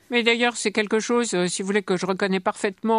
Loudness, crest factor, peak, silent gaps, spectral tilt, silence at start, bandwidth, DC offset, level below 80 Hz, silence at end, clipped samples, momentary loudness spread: -23 LUFS; 18 dB; -4 dBFS; none; -3.5 dB/octave; 0.1 s; 11.5 kHz; under 0.1%; -70 dBFS; 0 s; under 0.1%; 5 LU